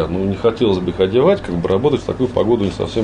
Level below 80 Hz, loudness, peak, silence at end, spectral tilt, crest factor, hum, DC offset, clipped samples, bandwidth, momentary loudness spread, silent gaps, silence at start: -38 dBFS; -17 LUFS; -2 dBFS; 0 s; -7.5 dB/octave; 14 dB; none; under 0.1%; under 0.1%; 10 kHz; 5 LU; none; 0 s